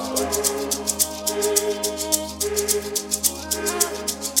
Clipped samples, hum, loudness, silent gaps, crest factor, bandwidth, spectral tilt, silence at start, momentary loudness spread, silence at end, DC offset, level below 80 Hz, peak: under 0.1%; none; -22 LUFS; none; 22 dB; 17 kHz; -1.5 dB/octave; 0 s; 4 LU; 0 s; under 0.1%; -46 dBFS; -2 dBFS